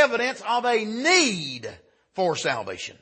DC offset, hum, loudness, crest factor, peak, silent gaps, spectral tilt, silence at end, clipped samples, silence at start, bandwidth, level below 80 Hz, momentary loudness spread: under 0.1%; none; -23 LUFS; 20 dB; -4 dBFS; none; -2.5 dB/octave; 0.1 s; under 0.1%; 0 s; 8.8 kHz; -70 dBFS; 16 LU